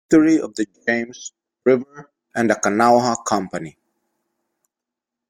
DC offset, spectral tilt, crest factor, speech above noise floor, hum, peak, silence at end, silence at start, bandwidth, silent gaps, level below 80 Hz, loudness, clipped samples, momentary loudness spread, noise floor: under 0.1%; -4.5 dB/octave; 18 dB; 67 dB; none; -2 dBFS; 1.6 s; 0.1 s; 15 kHz; none; -58 dBFS; -19 LUFS; under 0.1%; 19 LU; -85 dBFS